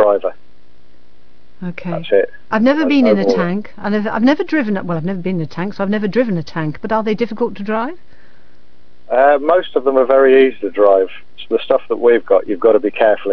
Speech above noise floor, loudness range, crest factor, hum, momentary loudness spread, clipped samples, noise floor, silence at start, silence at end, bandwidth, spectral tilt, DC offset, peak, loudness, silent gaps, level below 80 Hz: 38 dB; 6 LU; 16 dB; none; 11 LU; under 0.1%; -53 dBFS; 0 s; 0 s; 5.4 kHz; -8 dB/octave; 4%; 0 dBFS; -15 LUFS; none; -56 dBFS